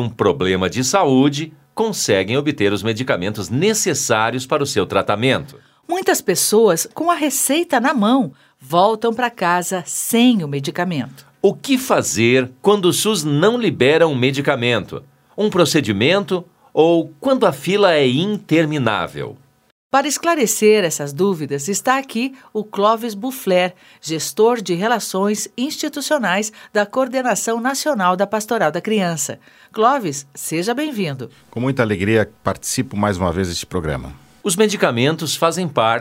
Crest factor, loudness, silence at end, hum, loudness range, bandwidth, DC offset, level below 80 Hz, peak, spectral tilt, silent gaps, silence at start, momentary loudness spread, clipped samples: 18 dB; -18 LUFS; 0 s; none; 4 LU; 16.5 kHz; under 0.1%; -52 dBFS; 0 dBFS; -4 dB/octave; 19.72-19.90 s; 0 s; 9 LU; under 0.1%